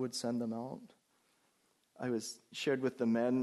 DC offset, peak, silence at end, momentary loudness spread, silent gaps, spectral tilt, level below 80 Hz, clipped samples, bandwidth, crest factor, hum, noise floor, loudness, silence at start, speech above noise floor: under 0.1%; -22 dBFS; 0 s; 11 LU; none; -5 dB/octave; -82 dBFS; under 0.1%; 12 kHz; 16 dB; none; -75 dBFS; -37 LUFS; 0 s; 40 dB